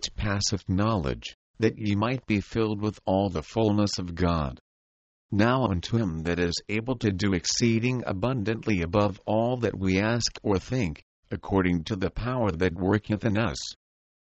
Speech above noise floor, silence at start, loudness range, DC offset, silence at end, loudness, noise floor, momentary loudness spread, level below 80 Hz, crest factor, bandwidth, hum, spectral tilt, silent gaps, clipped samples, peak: over 64 dB; 0 s; 2 LU; under 0.1%; 0.55 s; -27 LUFS; under -90 dBFS; 6 LU; -44 dBFS; 18 dB; 8.2 kHz; none; -5.5 dB/octave; 1.34-1.54 s, 4.61-5.29 s, 11.02-11.23 s; under 0.1%; -8 dBFS